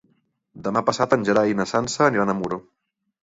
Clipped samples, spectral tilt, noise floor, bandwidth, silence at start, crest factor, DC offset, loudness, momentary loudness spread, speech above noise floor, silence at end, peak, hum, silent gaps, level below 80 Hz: under 0.1%; -5 dB/octave; -66 dBFS; 8 kHz; 0.55 s; 20 dB; under 0.1%; -21 LUFS; 10 LU; 45 dB; 0.65 s; -4 dBFS; none; none; -58 dBFS